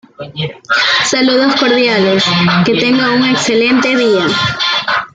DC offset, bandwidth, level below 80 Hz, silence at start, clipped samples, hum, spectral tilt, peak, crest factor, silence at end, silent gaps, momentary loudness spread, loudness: under 0.1%; 9.4 kHz; -50 dBFS; 0.2 s; under 0.1%; none; -4 dB/octave; 0 dBFS; 12 dB; 0.1 s; none; 4 LU; -11 LUFS